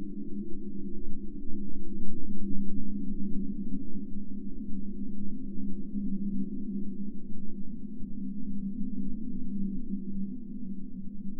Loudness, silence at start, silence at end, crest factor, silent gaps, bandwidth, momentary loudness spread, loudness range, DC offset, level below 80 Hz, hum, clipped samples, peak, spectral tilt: -38 LUFS; 0 s; 0 s; 14 dB; none; 0.6 kHz; 6 LU; 1 LU; under 0.1%; -40 dBFS; none; under 0.1%; -10 dBFS; -14.5 dB/octave